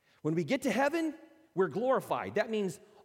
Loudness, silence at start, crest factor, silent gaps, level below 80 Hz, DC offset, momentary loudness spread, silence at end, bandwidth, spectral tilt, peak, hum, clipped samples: -32 LUFS; 0.25 s; 16 dB; none; -76 dBFS; under 0.1%; 7 LU; 0.25 s; 16.5 kHz; -5.5 dB/octave; -16 dBFS; none; under 0.1%